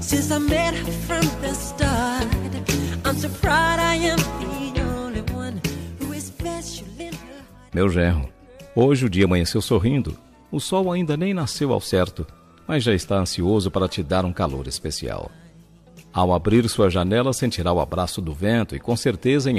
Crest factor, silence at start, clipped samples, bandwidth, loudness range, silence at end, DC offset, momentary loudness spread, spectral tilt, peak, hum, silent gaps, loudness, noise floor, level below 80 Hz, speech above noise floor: 16 dB; 0 s; under 0.1%; 15 kHz; 5 LU; 0 s; under 0.1%; 12 LU; -5.5 dB/octave; -6 dBFS; none; none; -22 LUFS; -49 dBFS; -36 dBFS; 28 dB